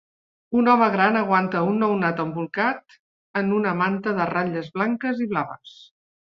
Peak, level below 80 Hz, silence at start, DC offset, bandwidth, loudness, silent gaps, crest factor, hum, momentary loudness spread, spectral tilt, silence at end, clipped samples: -4 dBFS; -64 dBFS; 0.5 s; under 0.1%; 6.2 kHz; -22 LUFS; 3.00-3.34 s; 20 dB; none; 9 LU; -8.5 dB/octave; 0.5 s; under 0.1%